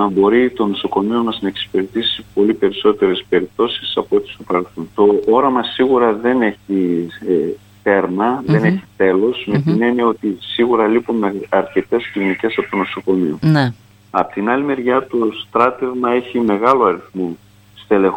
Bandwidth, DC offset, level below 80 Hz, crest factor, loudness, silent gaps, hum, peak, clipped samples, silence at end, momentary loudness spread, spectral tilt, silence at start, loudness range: 16.5 kHz; under 0.1%; -54 dBFS; 16 dB; -16 LUFS; none; none; 0 dBFS; under 0.1%; 0 s; 7 LU; -7.5 dB/octave; 0 s; 2 LU